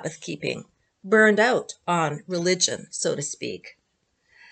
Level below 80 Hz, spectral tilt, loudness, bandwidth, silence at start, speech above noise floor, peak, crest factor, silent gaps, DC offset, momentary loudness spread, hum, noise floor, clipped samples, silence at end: -72 dBFS; -3 dB/octave; -23 LUFS; 9.2 kHz; 0 s; 48 dB; -4 dBFS; 20 dB; none; under 0.1%; 15 LU; none; -72 dBFS; under 0.1%; 0.8 s